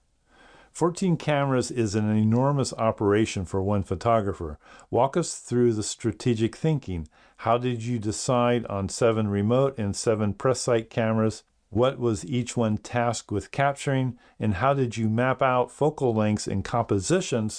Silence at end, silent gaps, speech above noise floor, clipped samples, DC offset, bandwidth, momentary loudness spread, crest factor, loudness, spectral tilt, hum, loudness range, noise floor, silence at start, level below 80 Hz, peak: 0 s; none; 33 dB; under 0.1%; under 0.1%; 10.5 kHz; 6 LU; 18 dB; -25 LUFS; -6 dB/octave; none; 2 LU; -58 dBFS; 0.75 s; -52 dBFS; -8 dBFS